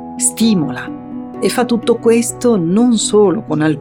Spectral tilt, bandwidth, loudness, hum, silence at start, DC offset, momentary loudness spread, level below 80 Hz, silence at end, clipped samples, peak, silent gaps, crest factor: -4.5 dB/octave; 17.5 kHz; -14 LUFS; none; 0 s; under 0.1%; 12 LU; -52 dBFS; 0 s; under 0.1%; -2 dBFS; none; 12 dB